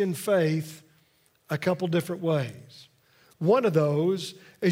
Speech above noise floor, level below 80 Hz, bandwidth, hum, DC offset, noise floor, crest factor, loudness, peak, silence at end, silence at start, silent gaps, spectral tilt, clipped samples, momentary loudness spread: 39 dB; -74 dBFS; 16 kHz; none; under 0.1%; -65 dBFS; 18 dB; -26 LUFS; -10 dBFS; 0 s; 0 s; none; -6.5 dB/octave; under 0.1%; 13 LU